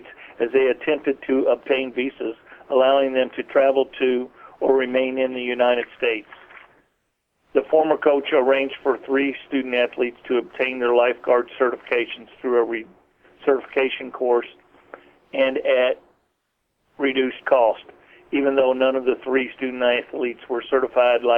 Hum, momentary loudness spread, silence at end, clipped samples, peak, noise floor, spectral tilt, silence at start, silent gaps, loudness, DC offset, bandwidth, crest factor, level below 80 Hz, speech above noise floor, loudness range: none; 9 LU; 0 s; under 0.1%; -4 dBFS; -73 dBFS; -6.5 dB/octave; 0.05 s; none; -21 LUFS; under 0.1%; 4.2 kHz; 18 dB; -64 dBFS; 53 dB; 3 LU